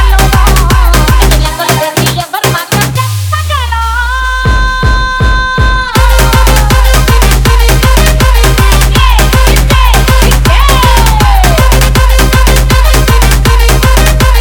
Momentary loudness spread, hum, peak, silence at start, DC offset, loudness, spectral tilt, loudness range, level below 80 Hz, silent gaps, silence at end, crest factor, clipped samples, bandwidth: 4 LU; none; 0 dBFS; 0 s; under 0.1%; -7 LUFS; -4 dB/octave; 4 LU; -8 dBFS; none; 0 s; 6 dB; 0.7%; over 20 kHz